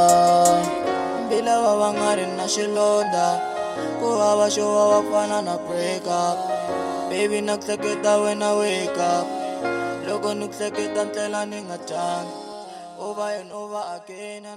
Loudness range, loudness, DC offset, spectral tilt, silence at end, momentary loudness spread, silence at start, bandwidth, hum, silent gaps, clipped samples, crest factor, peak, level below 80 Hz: 7 LU; -22 LUFS; under 0.1%; -3.5 dB/octave; 0 s; 13 LU; 0 s; 16 kHz; none; none; under 0.1%; 18 dB; -4 dBFS; -64 dBFS